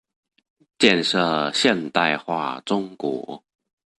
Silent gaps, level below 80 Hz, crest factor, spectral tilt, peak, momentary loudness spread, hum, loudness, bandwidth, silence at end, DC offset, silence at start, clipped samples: none; -66 dBFS; 22 dB; -4 dB/octave; -2 dBFS; 11 LU; none; -21 LUFS; 11.5 kHz; 0.6 s; under 0.1%; 0.8 s; under 0.1%